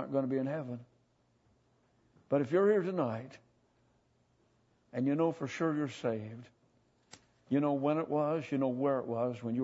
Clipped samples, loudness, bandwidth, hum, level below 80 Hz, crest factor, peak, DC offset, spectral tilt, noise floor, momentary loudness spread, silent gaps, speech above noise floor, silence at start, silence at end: under 0.1%; -33 LUFS; 8 kHz; none; -80 dBFS; 18 dB; -18 dBFS; under 0.1%; -8 dB/octave; -72 dBFS; 14 LU; none; 40 dB; 0 s; 0 s